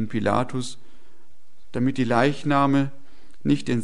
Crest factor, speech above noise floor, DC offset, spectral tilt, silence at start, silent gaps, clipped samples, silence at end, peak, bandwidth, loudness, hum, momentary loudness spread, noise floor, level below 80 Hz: 20 dB; 39 dB; 3%; -6.5 dB/octave; 0 s; none; under 0.1%; 0 s; -4 dBFS; 11 kHz; -23 LUFS; none; 11 LU; -61 dBFS; -56 dBFS